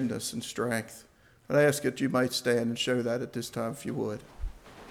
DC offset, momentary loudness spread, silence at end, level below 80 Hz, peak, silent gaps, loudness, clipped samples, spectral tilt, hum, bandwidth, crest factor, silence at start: under 0.1%; 19 LU; 0 s; -50 dBFS; -12 dBFS; none; -30 LUFS; under 0.1%; -4.5 dB/octave; none; 18 kHz; 18 dB; 0 s